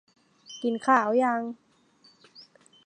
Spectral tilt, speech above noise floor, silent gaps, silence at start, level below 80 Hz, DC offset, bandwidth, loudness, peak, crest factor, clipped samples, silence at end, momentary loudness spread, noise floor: -4.5 dB/octave; 37 dB; none; 0.5 s; -84 dBFS; under 0.1%; 9.6 kHz; -25 LUFS; -8 dBFS; 22 dB; under 0.1%; 0.45 s; 21 LU; -61 dBFS